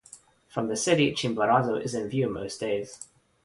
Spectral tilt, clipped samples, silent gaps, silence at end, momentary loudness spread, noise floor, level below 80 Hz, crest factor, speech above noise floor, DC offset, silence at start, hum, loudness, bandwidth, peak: -4.5 dB/octave; under 0.1%; none; 0.4 s; 14 LU; -53 dBFS; -60 dBFS; 20 dB; 27 dB; under 0.1%; 0.15 s; none; -27 LUFS; 11.5 kHz; -8 dBFS